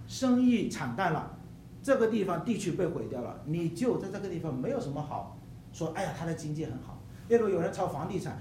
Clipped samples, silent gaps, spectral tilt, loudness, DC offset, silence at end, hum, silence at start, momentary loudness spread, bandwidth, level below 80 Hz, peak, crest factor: under 0.1%; none; -6.5 dB/octave; -31 LUFS; under 0.1%; 0 s; none; 0 s; 16 LU; 15 kHz; -58 dBFS; -12 dBFS; 18 dB